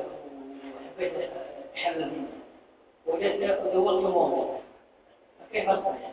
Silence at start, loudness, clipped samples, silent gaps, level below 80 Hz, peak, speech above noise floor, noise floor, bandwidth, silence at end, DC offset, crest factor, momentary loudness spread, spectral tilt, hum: 0 s; -28 LUFS; under 0.1%; none; -66 dBFS; -10 dBFS; 32 dB; -59 dBFS; 4 kHz; 0 s; under 0.1%; 18 dB; 18 LU; -8.5 dB/octave; none